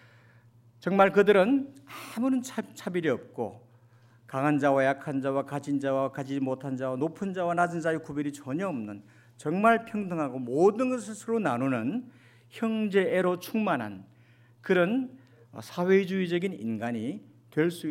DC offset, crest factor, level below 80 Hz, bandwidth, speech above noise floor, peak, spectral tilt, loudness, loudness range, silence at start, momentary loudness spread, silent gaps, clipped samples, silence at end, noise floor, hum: under 0.1%; 20 dB; -76 dBFS; 16 kHz; 31 dB; -8 dBFS; -6.5 dB/octave; -28 LUFS; 4 LU; 0.8 s; 14 LU; none; under 0.1%; 0 s; -58 dBFS; none